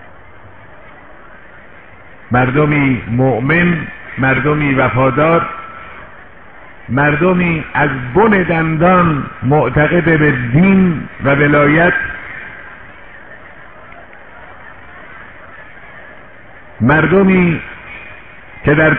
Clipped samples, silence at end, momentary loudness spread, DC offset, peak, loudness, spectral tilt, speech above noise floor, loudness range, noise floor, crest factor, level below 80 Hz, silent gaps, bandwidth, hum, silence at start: under 0.1%; 0 s; 25 LU; 1%; 0 dBFS; -12 LUFS; -11.5 dB/octave; 28 dB; 7 LU; -39 dBFS; 14 dB; -38 dBFS; none; 3.9 kHz; none; 0.45 s